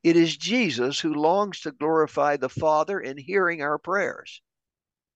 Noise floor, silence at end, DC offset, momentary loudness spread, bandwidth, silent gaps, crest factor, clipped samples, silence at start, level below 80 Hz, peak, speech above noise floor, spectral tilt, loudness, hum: under -90 dBFS; 0.8 s; under 0.1%; 8 LU; 8.4 kHz; none; 16 dB; under 0.1%; 0.05 s; -68 dBFS; -8 dBFS; over 66 dB; -4.5 dB/octave; -24 LUFS; none